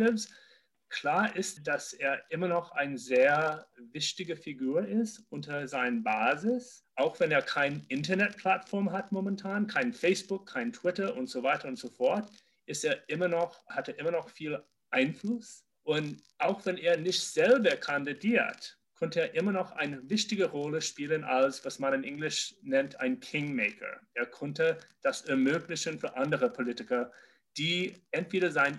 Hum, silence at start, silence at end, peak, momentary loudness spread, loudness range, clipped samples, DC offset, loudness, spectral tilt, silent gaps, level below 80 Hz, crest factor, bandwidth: none; 0 s; 0 s; -12 dBFS; 10 LU; 4 LU; under 0.1%; under 0.1%; -31 LUFS; -4 dB/octave; none; -78 dBFS; 20 dB; 12.5 kHz